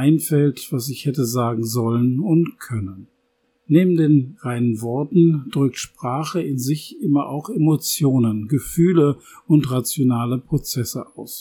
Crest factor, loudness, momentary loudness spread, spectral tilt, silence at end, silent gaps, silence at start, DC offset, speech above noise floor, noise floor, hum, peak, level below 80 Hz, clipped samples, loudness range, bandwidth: 18 dB; -20 LUFS; 10 LU; -6.5 dB/octave; 0 s; none; 0 s; under 0.1%; 48 dB; -67 dBFS; none; -2 dBFS; -52 dBFS; under 0.1%; 2 LU; 19 kHz